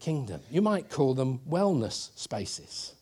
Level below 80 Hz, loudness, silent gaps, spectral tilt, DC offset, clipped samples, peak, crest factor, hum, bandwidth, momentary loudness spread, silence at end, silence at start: -64 dBFS; -30 LUFS; none; -6 dB/octave; under 0.1%; under 0.1%; -14 dBFS; 16 dB; none; 13 kHz; 9 LU; 0.1 s; 0 s